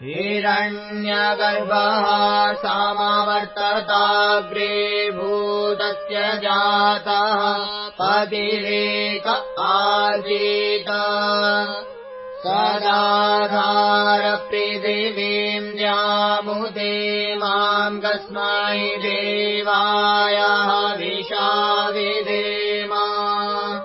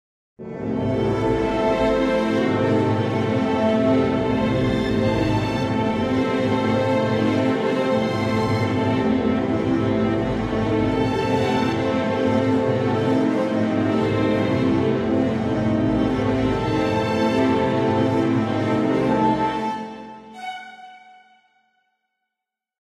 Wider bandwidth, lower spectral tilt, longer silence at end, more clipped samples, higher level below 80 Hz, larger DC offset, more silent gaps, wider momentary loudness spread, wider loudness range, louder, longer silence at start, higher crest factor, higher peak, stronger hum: second, 5.8 kHz vs 11 kHz; about the same, -7 dB/octave vs -7.5 dB/octave; second, 0 s vs 1.85 s; neither; second, -62 dBFS vs -42 dBFS; neither; neither; first, 6 LU vs 3 LU; about the same, 2 LU vs 2 LU; about the same, -19 LUFS vs -21 LUFS; second, 0 s vs 0.4 s; about the same, 16 dB vs 14 dB; first, -4 dBFS vs -8 dBFS; neither